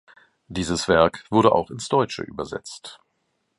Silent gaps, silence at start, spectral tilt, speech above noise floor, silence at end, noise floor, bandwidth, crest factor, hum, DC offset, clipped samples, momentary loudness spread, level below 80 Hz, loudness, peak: none; 0.5 s; -5 dB/octave; 51 dB; 0.65 s; -73 dBFS; 11.5 kHz; 22 dB; none; under 0.1%; under 0.1%; 17 LU; -48 dBFS; -22 LUFS; -2 dBFS